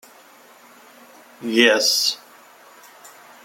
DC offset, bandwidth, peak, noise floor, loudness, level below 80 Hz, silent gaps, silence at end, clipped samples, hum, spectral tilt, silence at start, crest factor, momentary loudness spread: under 0.1%; 16.5 kHz; -2 dBFS; -49 dBFS; -17 LUFS; -78 dBFS; none; 0.35 s; under 0.1%; none; -1 dB/octave; 1.4 s; 22 dB; 19 LU